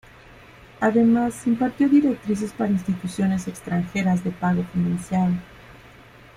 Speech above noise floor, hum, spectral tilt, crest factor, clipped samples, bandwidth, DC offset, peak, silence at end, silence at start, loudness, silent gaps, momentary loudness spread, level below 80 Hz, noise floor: 26 dB; none; -7.5 dB/octave; 14 dB; under 0.1%; 14 kHz; under 0.1%; -8 dBFS; 0.6 s; 0.8 s; -22 LUFS; none; 9 LU; -52 dBFS; -47 dBFS